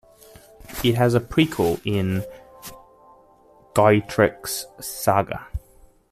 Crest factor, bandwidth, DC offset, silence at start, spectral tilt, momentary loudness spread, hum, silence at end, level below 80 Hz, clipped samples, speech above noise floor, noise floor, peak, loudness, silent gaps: 20 dB; 15 kHz; under 0.1%; 0.65 s; -5.5 dB/octave; 20 LU; none; 0.55 s; -46 dBFS; under 0.1%; 33 dB; -53 dBFS; -4 dBFS; -22 LUFS; none